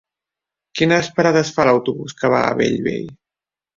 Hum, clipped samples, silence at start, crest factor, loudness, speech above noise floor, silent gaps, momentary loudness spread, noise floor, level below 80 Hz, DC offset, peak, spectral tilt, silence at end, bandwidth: none; under 0.1%; 0.75 s; 18 dB; -17 LUFS; 72 dB; none; 11 LU; -89 dBFS; -54 dBFS; under 0.1%; -2 dBFS; -5.5 dB/octave; 0.65 s; 7.6 kHz